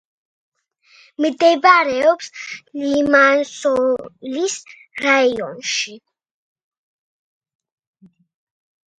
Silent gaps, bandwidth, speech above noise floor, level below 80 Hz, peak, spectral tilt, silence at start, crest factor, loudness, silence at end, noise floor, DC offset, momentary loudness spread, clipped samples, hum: none; 10.5 kHz; 36 dB; -62 dBFS; 0 dBFS; -2.5 dB/octave; 1.2 s; 20 dB; -17 LUFS; 3.05 s; -53 dBFS; under 0.1%; 16 LU; under 0.1%; none